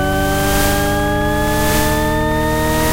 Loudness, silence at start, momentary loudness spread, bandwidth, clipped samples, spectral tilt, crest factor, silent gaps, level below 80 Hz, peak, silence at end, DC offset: -16 LUFS; 0 s; 2 LU; 16 kHz; under 0.1%; -4.5 dB/octave; 12 dB; none; -24 dBFS; -4 dBFS; 0 s; under 0.1%